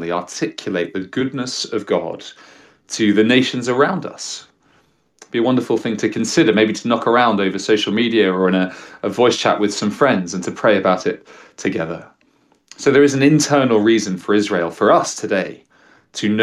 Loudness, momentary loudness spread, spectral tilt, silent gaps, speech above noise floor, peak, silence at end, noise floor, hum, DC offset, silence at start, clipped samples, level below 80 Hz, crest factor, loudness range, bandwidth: -17 LUFS; 12 LU; -4.5 dB/octave; none; 41 dB; -2 dBFS; 0 s; -58 dBFS; none; under 0.1%; 0 s; under 0.1%; -64 dBFS; 16 dB; 4 LU; 13 kHz